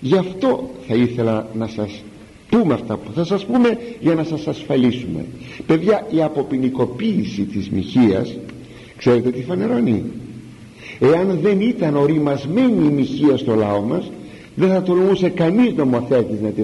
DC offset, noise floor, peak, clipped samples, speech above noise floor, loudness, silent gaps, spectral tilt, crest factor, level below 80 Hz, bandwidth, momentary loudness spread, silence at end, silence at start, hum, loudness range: under 0.1%; -38 dBFS; -4 dBFS; under 0.1%; 21 dB; -18 LUFS; none; -8 dB/octave; 14 dB; -50 dBFS; 11.5 kHz; 13 LU; 0 s; 0 s; none; 3 LU